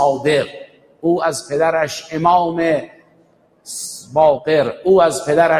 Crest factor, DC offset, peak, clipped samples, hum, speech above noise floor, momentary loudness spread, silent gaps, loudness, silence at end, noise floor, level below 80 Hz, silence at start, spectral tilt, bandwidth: 16 dB; under 0.1%; -2 dBFS; under 0.1%; none; 39 dB; 13 LU; none; -17 LUFS; 0 s; -54 dBFS; -56 dBFS; 0 s; -4.5 dB/octave; 16 kHz